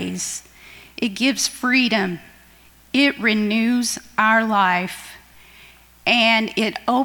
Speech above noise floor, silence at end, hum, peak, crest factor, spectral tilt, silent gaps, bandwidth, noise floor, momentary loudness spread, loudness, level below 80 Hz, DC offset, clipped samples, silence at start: 31 dB; 0 s; none; -4 dBFS; 18 dB; -3 dB/octave; none; 19 kHz; -50 dBFS; 13 LU; -19 LUFS; -56 dBFS; under 0.1%; under 0.1%; 0 s